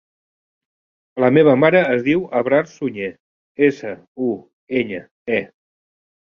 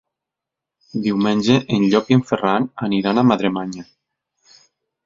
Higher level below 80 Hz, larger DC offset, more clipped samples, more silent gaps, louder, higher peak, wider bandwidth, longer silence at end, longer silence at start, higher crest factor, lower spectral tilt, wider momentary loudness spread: about the same, -60 dBFS vs -56 dBFS; neither; neither; first, 3.20-3.55 s, 4.08-4.15 s, 4.53-4.67 s, 5.11-5.26 s vs none; about the same, -18 LUFS vs -18 LUFS; about the same, -2 dBFS vs -2 dBFS; about the same, 7 kHz vs 7.6 kHz; second, 0.85 s vs 1.2 s; first, 1.15 s vs 0.95 s; about the same, 18 dB vs 18 dB; about the same, -7.5 dB/octave vs -6.5 dB/octave; first, 17 LU vs 11 LU